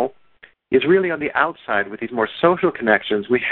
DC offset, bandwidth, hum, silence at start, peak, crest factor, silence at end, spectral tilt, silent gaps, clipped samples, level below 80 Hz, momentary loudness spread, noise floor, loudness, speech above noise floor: under 0.1%; 4.2 kHz; none; 0 s; -2 dBFS; 18 dB; 0 s; -9.5 dB/octave; none; under 0.1%; -56 dBFS; 6 LU; -51 dBFS; -19 LUFS; 32 dB